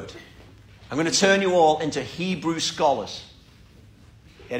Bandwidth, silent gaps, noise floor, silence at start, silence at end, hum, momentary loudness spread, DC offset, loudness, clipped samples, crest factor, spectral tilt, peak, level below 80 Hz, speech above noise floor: 16 kHz; none; -50 dBFS; 0 s; 0 s; none; 18 LU; under 0.1%; -22 LUFS; under 0.1%; 20 dB; -3.5 dB/octave; -6 dBFS; -54 dBFS; 28 dB